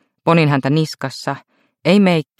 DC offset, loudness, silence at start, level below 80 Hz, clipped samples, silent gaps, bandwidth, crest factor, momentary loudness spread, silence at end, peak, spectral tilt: under 0.1%; -16 LUFS; 0.25 s; -62 dBFS; under 0.1%; none; 14 kHz; 16 dB; 12 LU; 0.2 s; -2 dBFS; -7 dB/octave